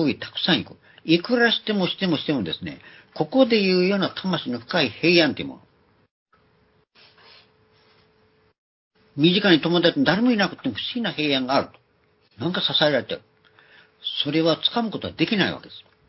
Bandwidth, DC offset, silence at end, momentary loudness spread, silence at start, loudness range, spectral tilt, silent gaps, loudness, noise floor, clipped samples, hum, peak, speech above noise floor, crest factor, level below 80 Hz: 6 kHz; under 0.1%; 0.3 s; 15 LU; 0 s; 4 LU; -8 dB/octave; 6.11-6.26 s, 8.58-8.91 s; -21 LUFS; -63 dBFS; under 0.1%; none; -2 dBFS; 41 dB; 22 dB; -60 dBFS